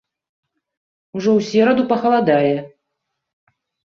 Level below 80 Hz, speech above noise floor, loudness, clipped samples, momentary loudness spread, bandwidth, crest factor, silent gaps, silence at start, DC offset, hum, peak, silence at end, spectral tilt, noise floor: -64 dBFS; 61 dB; -16 LUFS; under 0.1%; 8 LU; 7.2 kHz; 16 dB; none; 1.15 s; under 0.1%; none; -4 dBFS; 1.3 s; -6.5 dB/octave; -77 dBFS